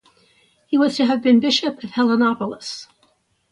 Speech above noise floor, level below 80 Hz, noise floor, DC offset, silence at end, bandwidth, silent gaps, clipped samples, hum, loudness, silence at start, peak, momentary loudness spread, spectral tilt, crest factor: 44 dB; -64 dBFS; -62 dBFS; under 0.1%; 0.65 s; 10.5 kHz; none; under 0.1%; none; -18 LUFS; 0.7 s; -4 dBFS; 14 LU; -4.5 dB/octave; 16 dB